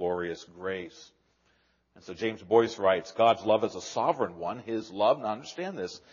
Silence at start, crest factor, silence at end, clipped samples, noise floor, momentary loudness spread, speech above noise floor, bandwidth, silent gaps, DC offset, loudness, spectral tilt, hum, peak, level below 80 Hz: 0 s; 20 dB; 0.15 s; under 0.1%; -69 dBFS; 12 LU; 41 dB; 7.2 kHz; none; under 0.1%; -29 LUFS; -3.5 dB/octave; none; -8 dBFS; -70 dBFS